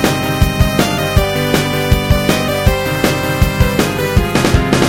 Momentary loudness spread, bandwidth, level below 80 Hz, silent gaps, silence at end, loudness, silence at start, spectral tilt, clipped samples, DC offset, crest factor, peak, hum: 2 LU; 17.5 kHz; -20 dBFS; none; 0 s; -14 LUFS; 0 s; -5 dB/octave; under 0.1%; under 0.1%; 12 dB; 0 dBFS; none